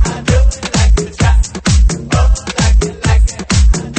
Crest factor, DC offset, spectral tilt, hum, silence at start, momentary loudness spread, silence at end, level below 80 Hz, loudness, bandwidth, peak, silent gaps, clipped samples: 10 dB; 0.2%; -5 dB/octave; none; 0 s; 2 LU; 0 s; -12 dBFS; -13 LUFS; 8.8 kHz; 0 dBFS; none; under 0.1%